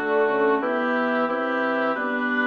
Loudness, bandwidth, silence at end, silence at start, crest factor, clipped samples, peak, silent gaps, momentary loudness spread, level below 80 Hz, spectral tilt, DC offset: -23 LUFS; 6.6 kHz; 0 s; 0 s; 12 dB; under 0.1%; -10 dBFS; none; 3 LU; -72 dBFS; -6 dB/octave; under 0.1%